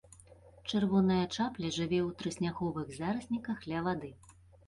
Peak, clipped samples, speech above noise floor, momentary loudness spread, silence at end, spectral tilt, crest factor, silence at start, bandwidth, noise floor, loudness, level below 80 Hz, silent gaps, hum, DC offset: -18 dBFS; under 0.1%; 25 dB; 9 LU; 0.35 s; -6 dB/octave; 16 dB; 0.3 s; 11.5 kHz; -58 dBFS; -34 LUFS; -60 dBFS; none; none; under 0.1%